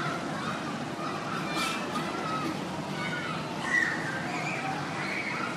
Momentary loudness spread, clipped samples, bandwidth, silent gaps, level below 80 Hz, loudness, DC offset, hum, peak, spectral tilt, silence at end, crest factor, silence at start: 7 LU; under 0.1%; 14.5 kHz; none; -64 dBFS; -31 LUFS; under 0.1%; none; -16 dBFS; -4 dB/octave; 0 s; 16 dB; 0 s